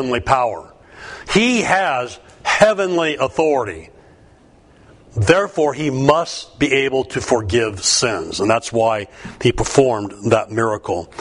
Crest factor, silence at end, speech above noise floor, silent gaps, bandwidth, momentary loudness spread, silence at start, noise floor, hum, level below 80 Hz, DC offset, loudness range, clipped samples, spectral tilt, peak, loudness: 18 dB; 0 s; 31 dB; none; 11 kHz; 11 LU; 0 s; -49 dBFS; none; -42 dBFS; under 0.1%; 2 LU; under 0.1%; -4 dB/octave; 0 dBFS; -17 LUFS